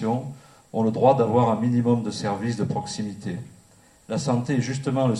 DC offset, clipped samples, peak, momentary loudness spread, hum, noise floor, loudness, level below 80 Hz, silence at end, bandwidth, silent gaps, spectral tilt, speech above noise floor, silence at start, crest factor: under 0.1%; under 0.1%; -4 dBFS; 13 LU; none; -55 dBFS; -24 LUFS; -60 dBFS; 0 s; 11.5 kHz; none; -7 dB/octave; 32 dB; 0 s; 18 dB